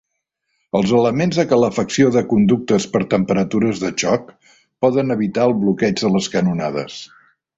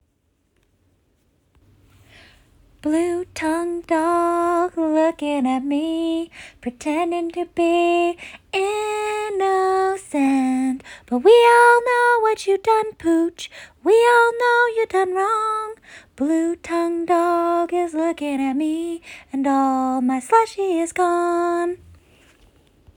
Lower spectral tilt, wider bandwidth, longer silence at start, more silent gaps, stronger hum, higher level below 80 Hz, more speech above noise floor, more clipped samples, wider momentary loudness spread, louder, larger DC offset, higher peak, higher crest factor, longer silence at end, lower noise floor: first, -6 dB/octave vs -3.5 dB/octave; second, 8 kHz vs 18 kHz; second, 0.75 s vs 2.85 s; neither; neither; first, -52 dBFS vs -58 dBFS; first, 58 dB vs 48 dB; neither; second, 6 LU vs 11 LU; about the same, -17 LUFS vs -19 LUFS; neither; about the same, -2 dBFS vs -2 dBFS; about the same, 16 dB vs 18 dB; second, 0.5 s vs 1.2 s; first, -74 dBFS vs -67 dBFS